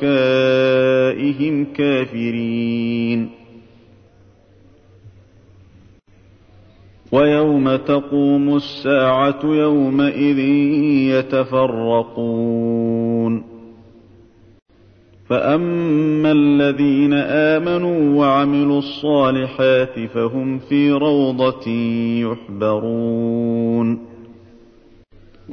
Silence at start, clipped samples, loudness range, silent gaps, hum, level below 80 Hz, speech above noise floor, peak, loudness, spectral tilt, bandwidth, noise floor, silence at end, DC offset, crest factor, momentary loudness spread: 0 s; under 0.1%; 7 LU; 14.62-14.66 s; none; -54 dBFS; 33 dB; -4 dBFS; -17 LUFS; -8.5 dB/octave; 6.4 kHz; -49 dBFS; 0 s; under 0.1%; 14 dB; 6 LU